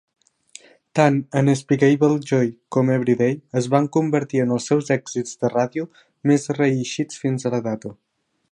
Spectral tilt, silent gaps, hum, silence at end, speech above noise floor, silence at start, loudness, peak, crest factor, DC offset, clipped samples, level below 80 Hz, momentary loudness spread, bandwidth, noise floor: -6.5 dB/octave; none; none; 0.6 s; 28 dB; 0.95 s; -21 LUFS; -2 dBFS; 18 dB; under 0.1%; under 0.1%; -66 dBFS; 8 LU; 11 kHz; -48 dBFS